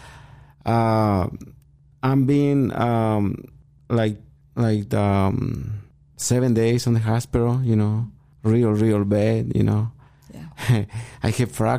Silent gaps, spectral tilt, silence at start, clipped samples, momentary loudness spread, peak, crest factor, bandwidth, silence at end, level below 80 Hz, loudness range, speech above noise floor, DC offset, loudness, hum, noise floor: none; -7 dB/octave; 0.05 s; under 0.1%; 13 LU; -8 dBFS; 12 dB; 15.5 kHz; 0 s; -46 dBFS; 2 LU; 32 dB; under 0.1%; -21 LUFS; none; -52 dBFS